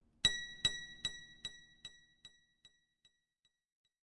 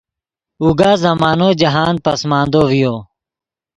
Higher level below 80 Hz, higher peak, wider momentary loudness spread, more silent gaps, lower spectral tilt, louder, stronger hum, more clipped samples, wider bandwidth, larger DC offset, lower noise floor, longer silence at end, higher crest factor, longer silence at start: second, -66 dBFS vs -44 dBFS; second, -16 dBFS vs 0 dBFS; first, 21 LU vs 5 LU; neither; second, 0 dB/octave vs -6 dB/octave; second, -38 LUFS vs -13 LUFS; neither; neither; about the same, 11.5 kHz vs 11.5 kHz; neither; second, -83 dBFS vs -88 dBFS; first, 1.75 s vs 0.75 s; first, 30 dB vs 14 dB; second, 0.25 s vs 0.6 s